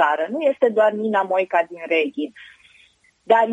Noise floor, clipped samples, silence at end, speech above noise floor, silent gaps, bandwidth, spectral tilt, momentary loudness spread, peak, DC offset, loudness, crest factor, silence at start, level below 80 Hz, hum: -56 dBFS; under 0.1%; 0 s; 37 dB; none; 9.2 kHz; -5.5 dB/octave; 7 LU; -2 dBFS; under 0.1%; -20 LUFS; 18 dB; 0 s; -76 dBFS; none